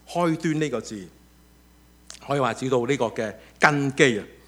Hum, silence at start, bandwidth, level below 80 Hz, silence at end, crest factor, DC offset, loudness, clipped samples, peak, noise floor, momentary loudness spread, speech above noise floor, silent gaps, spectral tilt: none; 0.1 s; 16.5 kHz; -58 dBFS; 0.2 s; 26 dB; under 0.1%; -23 LUFS; under 0.1%; 0 dBFS; -54 dBFS; 16 LU; 31 dB; none; -5 dB/octave